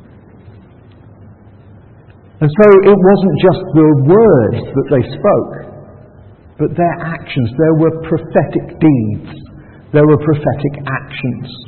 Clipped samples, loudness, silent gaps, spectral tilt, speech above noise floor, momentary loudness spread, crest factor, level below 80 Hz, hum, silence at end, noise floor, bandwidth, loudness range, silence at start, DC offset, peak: under 0.1%; -12 LUFS; none; -11 dB/octave; 29 dB; 13 LU; 12 dB; -42 dBFS; none; 0.05 s; -40 dBFS; 4.4 kHz; 7 LU; 0.45 s; under 0.1%; 0 dBFS